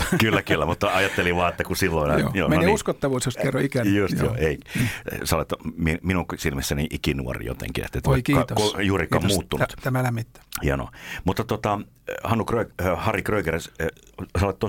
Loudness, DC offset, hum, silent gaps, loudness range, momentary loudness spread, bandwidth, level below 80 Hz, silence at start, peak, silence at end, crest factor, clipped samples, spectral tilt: -24 LUFS; under 0.1%; none; none; 4 LU; 9 LU; 17 kHz; -38 dBFS; 0 s; -4 dBFS; 0 s; 20 dB; under 0.1%; -5.5 dB/octave